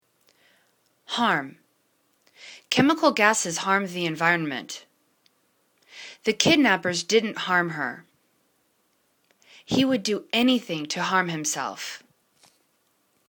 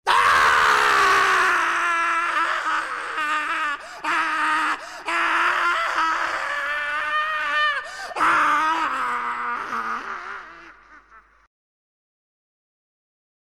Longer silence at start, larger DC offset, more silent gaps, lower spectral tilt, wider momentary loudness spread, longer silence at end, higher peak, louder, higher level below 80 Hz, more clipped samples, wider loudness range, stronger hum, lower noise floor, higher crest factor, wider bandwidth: first, 1.1 s vs 0.05 s; neither; neither; first, -3 dB/octave vs -1 dB/octave; first, 19 LU vs 11 LU; second, 1.3 s vs 2.25 s; first, 0 dBFS vs -6 dBFS; second, -23 LUFS vs -20 LUFS; second, -66 dBFS vs -58 dBFS; neither; second, 3 LU vs 11 LU; neither; first, -69 dBFS vs -51 dBFS; first, 26 dB vs 16 dB; first, 19 kHz vs 16.5 kHz